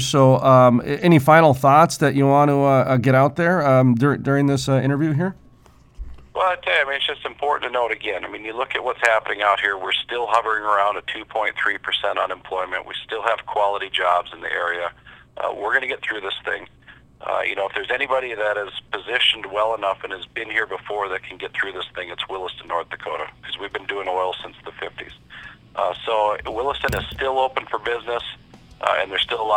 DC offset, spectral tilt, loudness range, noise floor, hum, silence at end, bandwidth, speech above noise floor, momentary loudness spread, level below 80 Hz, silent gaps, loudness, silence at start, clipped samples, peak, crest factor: under 0.1%; -5.5 dB/octave; 11 LU; -50 dBFS; none; 0 s; 16.5 kHz; 30 dB; 14 LU; -50 dBFS; none; -20 LUFS; 0 s; under 0.1%; 0 dBFS; 20 dB